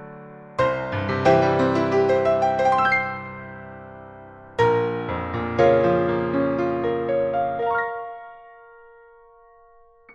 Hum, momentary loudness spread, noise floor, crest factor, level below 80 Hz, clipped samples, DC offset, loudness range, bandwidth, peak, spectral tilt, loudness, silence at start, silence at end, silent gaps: none; 21 LU; -53 dBFS; 18 dB; -52 dBFS; under 0.1%; under 0.1%; 6 LU; 8.4 kHz; -6 dBFS; -7 dB/octave; -21 LUFS; 0 s; 1.65 s; none